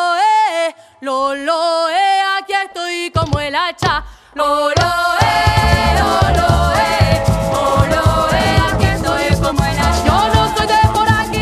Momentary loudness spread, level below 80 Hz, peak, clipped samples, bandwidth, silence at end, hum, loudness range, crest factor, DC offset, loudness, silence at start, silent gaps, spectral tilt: 6 LU; -24 dBFS; 0 dBFS; under 0.1%; 15 kHz; 0 s; none; 3 LU; 14 dB; under 0.1%; -14 LUFS; 0 s; none; -5 dB/octave